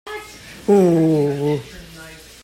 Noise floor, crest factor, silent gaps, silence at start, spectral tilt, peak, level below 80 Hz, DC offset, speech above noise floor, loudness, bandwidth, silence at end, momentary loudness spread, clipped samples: -40 dBFS; 14 dB; none; 0.05 s; -7.5 dB/octave; -4 dBFS; -50 dBFS; under 0.1%; 24 dB; -17 LUFS; 16 kHz; 0.3 s; 23 LU; under 0.1%